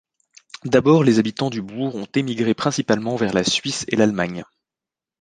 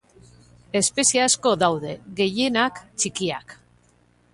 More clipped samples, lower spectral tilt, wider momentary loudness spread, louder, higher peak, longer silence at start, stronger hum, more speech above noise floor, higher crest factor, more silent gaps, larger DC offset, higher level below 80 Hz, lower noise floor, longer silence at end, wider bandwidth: neither; first, -5 dB/octave vs -2.5 dB/octave; about the same, 11 LU vs 10 LU; about the same, -20 LUFS vs -21 LUFS; about the same, -2 dBFS vs -4 dBFS; about the same, 0.65 s vs 0.75 s; second, none vs 60 Hz at -45 dBFS; first, 69 dB vs 37 dB; about the same, 18 dB vs 20 dB; neither; neither; about the same, -56 dBFS vs -60 dBFS; first, -89 dBFS vs -60 dBFS; about the same, 0.8 s vs 0.8 s; second, 9.8 kHz vs 11.5 kHz